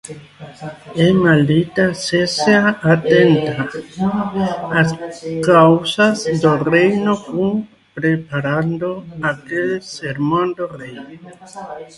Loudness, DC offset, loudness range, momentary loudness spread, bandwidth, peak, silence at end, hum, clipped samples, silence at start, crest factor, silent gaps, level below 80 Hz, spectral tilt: -16 LUFS; under 0.1%; 6 LU; 20 LU; 11.5 kHz; 0 dBFS; 0.1 s; none; under 0.1%; 0.05 s; 16 dB; none; -52 dBFS; -6 dB/octave